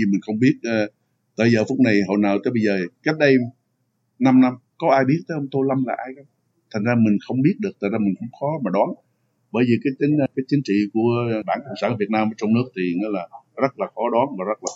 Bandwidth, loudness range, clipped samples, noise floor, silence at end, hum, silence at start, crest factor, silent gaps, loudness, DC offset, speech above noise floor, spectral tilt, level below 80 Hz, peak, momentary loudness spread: 7.8 kHz; 3 LU; under 0.1%; -70 dBFS; 0 s; none; 0 s; 18 dB; none; -21 LUFS; under 0.1%; 50 dB; -7 dB/octave; -72 dBFS; -2 dBFS; 9 LU